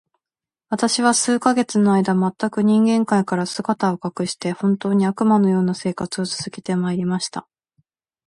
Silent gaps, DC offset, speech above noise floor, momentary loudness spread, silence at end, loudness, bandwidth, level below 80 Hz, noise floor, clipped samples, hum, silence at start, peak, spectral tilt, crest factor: none; under 0.1%; over 71 dB; 8 LU; 0.85 s; -20 LUFS; 11.5 kHz; -62 dBFS; under -90 dBFS; under 0.1%; none; 0.7 s; 0 dBFS; -5 dB/octave; 18 dB